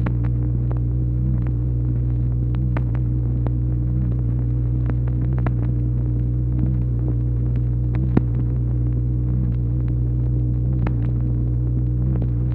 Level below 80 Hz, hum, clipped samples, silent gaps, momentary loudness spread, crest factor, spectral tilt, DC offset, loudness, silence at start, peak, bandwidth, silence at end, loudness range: -24 dBFS; none; under 0.1%; none; 1 LU; 20 dB; -12.5 dB/octave; under 0.1%; -22 LUFS; 0 s; 0 dBFS; 2.8 kHz; 0 s; 0 LU